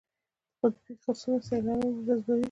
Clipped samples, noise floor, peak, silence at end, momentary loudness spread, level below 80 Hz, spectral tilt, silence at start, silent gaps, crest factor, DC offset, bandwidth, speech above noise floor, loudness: under 0.1%; -90 dBFS; -12 dBFS; 0 s; 6 LU; -62 dBFS; -7 dB/octave; 0.65 s; none; 18 dB; under 0.1%; 9.4 kHz; 60 dB; -30 LUFS